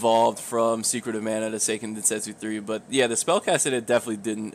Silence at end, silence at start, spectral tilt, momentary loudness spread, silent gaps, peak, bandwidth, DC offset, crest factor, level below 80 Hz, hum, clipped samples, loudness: 0.05 s; 0 s; -2.5 dB/octave; 8 LU; none; -10 dBFS; 15.5 kHz; under 0.1%; 16 dB; -72 dBFS; none; under 0.1%; -24 LUFS